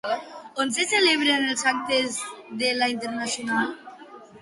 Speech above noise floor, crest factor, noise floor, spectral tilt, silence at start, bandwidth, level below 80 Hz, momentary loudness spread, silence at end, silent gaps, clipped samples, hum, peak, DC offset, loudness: 21 dB; 18 dB; -45 dBFS; -1.5 dB/octave; 0.05 s; 11.5 kHz; -70 dBFS; 14 LU; 0 s; none; under 0.1%; none; -8 dBFS; under 0.1%; -23 LUFS